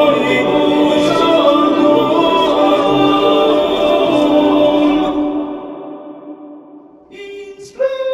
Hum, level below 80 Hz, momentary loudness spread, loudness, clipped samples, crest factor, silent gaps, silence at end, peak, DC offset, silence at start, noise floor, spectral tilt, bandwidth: none; -46 dBFS; 20 LU; -12 LUFS; under 0.1%; 14 dB; none; 0 s; 0 dBFS; under 0.1%; 0 s; -39 dBFS; -5.5 dB/octave; 14.5 kHz